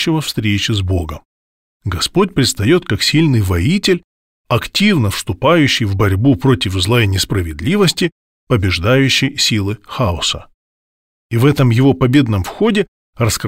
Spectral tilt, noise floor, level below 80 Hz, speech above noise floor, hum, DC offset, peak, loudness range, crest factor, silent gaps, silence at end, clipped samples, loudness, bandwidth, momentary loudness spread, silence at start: -5 dB/octave; under -90 dBFS; -36 dBFS; over 76 dB; none; 0.2%; 0 dBFS; 2 LU; 14 dB; 1.25-1.80 s, 4.04-4.45 s, 8.12-8.47 s, 10.54-11.30 s, 12.88-13.13 s; 0 s; under 0.1%; -14 LUFS; 16.5 kHz; 8 LU; 0 s